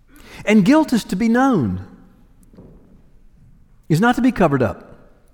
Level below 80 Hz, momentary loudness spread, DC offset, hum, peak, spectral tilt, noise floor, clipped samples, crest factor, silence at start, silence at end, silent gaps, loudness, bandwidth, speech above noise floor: -46 dBFS; 11 LU; under 0.1%; none; -4 dBFS; -6.5 dB/octave; -48 dBFS; under 0.1%; 16 dB; 0.3 s; 0.55 s; none; -17 LUFS; 18.5 kHz; 33 dB